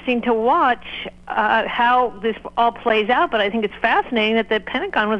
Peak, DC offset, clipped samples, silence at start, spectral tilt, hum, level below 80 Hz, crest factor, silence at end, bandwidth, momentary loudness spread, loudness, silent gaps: -4 dBFS; under 0.1%; under 0.1%; 0 s; -6 dB/octave; 60 Hz at -50 dBFS; -50 dBFS; 16 dB; 0 s; 8.2 kHz; 7 LU; -19 LUFS; none